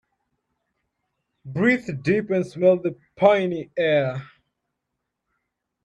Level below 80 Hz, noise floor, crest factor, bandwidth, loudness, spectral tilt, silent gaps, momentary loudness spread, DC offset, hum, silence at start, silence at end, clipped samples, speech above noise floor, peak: -62 dBFS; -81 dBFS; 20 dB; 9.2 kHz; -22 LUFS; -7.5 dB/octave; none; 10 LU; under 0.1%; none; 1.45 s; 1.6 s; under 0.1%; 60 dB; -4 dBFS